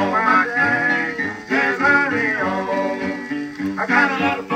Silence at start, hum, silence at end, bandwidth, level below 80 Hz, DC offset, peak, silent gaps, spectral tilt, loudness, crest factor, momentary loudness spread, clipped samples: 0 s; none; 0 s; 14.5 kHz; -60 dBFS; under 0.1%; -2 dBFS; none; -5.5 dB/octave; -18 LUFS; 18 dB; 10 LU; under 0.1%